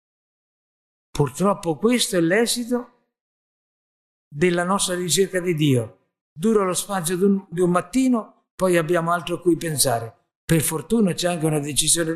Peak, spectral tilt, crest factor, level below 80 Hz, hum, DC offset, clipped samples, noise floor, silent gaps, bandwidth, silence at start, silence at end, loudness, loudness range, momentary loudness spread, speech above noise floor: -4 dBFS; -4.5 dB/octave; 18 dB; -50 dBFS; none; under 0.1%; under 0.1%; under -90 dBFS; 3.21-4.31 s, 6.21-6.36 s, 8.51-8.58 s, 10.35-10.48 s; 14 kHz; 1.15 s; 0 s; -21 LUFS; 2 LU; 6 LU; over 69 dB